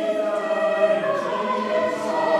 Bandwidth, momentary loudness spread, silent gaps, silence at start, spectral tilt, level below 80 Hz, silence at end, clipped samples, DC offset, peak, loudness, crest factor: 11.5 kHz; 4 LU; none; 0 s; -5 dB/octave; -70 dBFS; 0 s; under 0.1%; under 0.1%; -8 dBFS; -22 LUFS; 14 dB